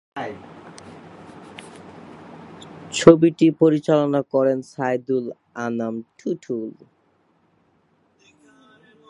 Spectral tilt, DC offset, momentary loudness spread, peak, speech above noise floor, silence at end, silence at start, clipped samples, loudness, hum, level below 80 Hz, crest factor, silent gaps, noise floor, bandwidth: -6.5 dB/octave; under 0.1%; 27 LU; 0 dBFS; 43 dB; 2.4 s; 0.15 s; under 0.1%; -20 LUFS; none; -60 dBFS; 22 dB; none; -63 dBFS; 11 kHz